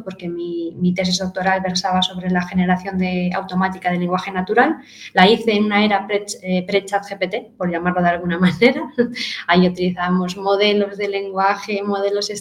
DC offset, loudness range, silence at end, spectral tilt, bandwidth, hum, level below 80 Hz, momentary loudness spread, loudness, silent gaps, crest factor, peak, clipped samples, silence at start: under 0.1%; 2 LU; 0 s; -5.5 dB/octave; 12 kHz; none; -52 dBFS; 8 LU; -19 LUFS; none; 18 dB; 0 dBFS; under 0.1%; 0 s